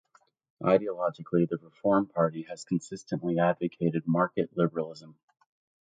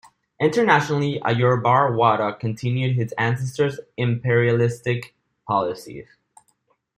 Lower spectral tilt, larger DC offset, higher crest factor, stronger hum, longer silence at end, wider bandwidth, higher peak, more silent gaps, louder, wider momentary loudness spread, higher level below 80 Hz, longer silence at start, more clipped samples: about the same, -7.5 dB/octave vs -6.5 dB/octave; neither; about the same, 20 dB vs 18 dB; neither; second, 0.7 s vs 0.95 s; second, 9.2 kHz vs 12.5 kHz; second, -8 dBFS vs -2 dBFS; neither; second, -29 LUFS vs -21 LUFS; about the same, 9 LU vs 10 LU; second, -68 dBFS vs -60 dBFS; first, 0.6 s vs 0.4 s; neither